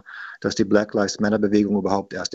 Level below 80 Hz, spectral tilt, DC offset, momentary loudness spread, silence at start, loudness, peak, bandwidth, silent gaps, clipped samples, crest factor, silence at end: -54 dBFS; -5 dB/octave; under 0.1%; 7 LU; 0.05 s; -21 LUFS; -2 dBFS; 8 kHz; none; under 0.1%; 20 dB; 0 s